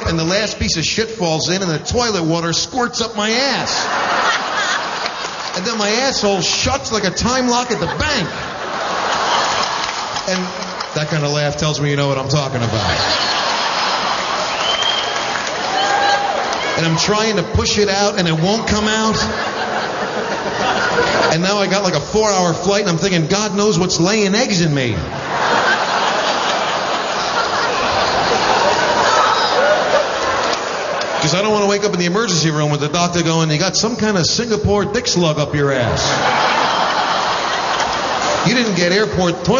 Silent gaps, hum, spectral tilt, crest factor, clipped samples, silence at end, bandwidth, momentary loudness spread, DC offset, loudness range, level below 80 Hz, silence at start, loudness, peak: none; none; -3.5 dB/octave; 14 dB; under 0.1%; 0 s; 7.4 kHz; 5 LU; under 0.1%; 2 LU; -40 dBFS; 0 s; -16 LUFS; -2 dBFS